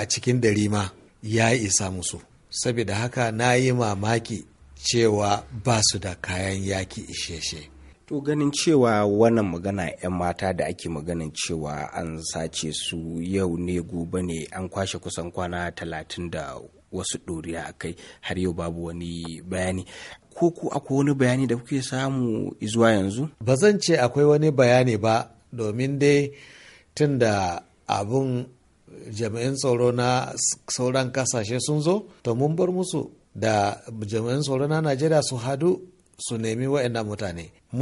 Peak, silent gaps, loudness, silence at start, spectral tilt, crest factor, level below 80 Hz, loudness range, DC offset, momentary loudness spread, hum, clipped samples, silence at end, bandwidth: -4 dBFS; none; -24 LUFS; 0 s; -5 dB/octave; 20 dB; -52 dBFS; 9 LU; under 0.1%; 13 LU; none; under 0.1%; 0 s; 11.5 kHz